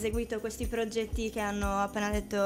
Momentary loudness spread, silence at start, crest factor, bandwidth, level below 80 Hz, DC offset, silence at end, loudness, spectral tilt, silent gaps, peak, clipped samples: 4 LU; 0 s; 14 dB; 16 kHz; -40 dBFS; under 0.1%; 0 s; -33 LUFS; -5 dB/octave; none; -16 dBFS; under 0.1%